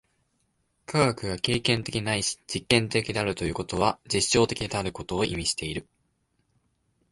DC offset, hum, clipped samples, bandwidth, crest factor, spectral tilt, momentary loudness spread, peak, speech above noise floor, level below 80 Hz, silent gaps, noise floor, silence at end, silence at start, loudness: under 0.1%; none; under 0.1%; 11.5 kHz; 22 dB; -4 dB/octave; 8 LU; -6 dBFS; 46 dB; -48 dBFS; none; -73 dBFS; 1.3 s; 0.9 s; -26 LUFS